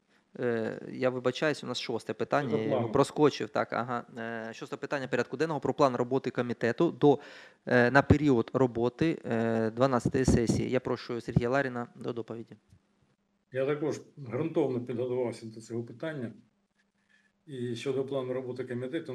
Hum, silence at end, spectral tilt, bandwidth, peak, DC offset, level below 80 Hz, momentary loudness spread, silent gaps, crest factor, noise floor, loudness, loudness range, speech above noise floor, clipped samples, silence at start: none; 0 s; -6.5 dB/octave; 12.5 kHz; -6 dBFS; under 0.1%; -52 dBFS; 13 LU; none; 24 dB; -74 dBFS; -30 LUFS; 9 LU; 44 dB; under 0.1%; 0.4 s